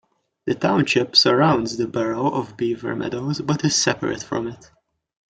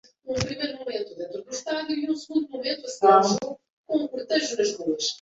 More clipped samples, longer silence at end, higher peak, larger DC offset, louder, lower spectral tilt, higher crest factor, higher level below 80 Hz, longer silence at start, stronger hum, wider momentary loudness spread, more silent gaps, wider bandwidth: neither; first, 0.75 s vs 0.05 s; about the same, -2 dBFS vs -4 dBFS; neither; first, -20 LUFS vs -25 LUFS; about the same, -4 dB/octave vs -3.5 dB/octave; about the same, 20 dB vs 22 dB; about the same, -56 dBFS vs -58 dBFS; first, 0.45 s vs 0.25 s; neither; second, 12 LU vs 15 LU; second, none vs 3.70-3.84 s; first, 9.4 kHz vs 8 kHz